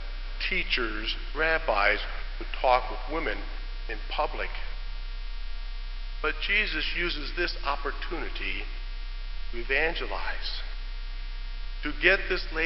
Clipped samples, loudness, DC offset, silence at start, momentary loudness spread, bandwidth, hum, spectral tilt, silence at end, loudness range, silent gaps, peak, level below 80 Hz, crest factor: under 0.1%; -29 LUFS; under 0.1%; 0 s; 16 LU; 6 kHz; none; -6.5 dB/octave; 0 s; 5 LU; none; -6 dBFS; -34 dBFS; 22 dB